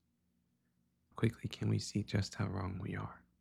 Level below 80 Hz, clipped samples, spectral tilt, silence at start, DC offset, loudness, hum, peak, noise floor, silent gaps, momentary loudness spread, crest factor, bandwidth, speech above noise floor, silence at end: -62 dBFS; under 0.1%; -6 dB/octave; 1.15 s; under 0.1%; -39 LUFS; none; -20 dBFS; -79 dBFS; none; 7 LU; 20 dB; 12 kHz; 41 dB; 0.25 s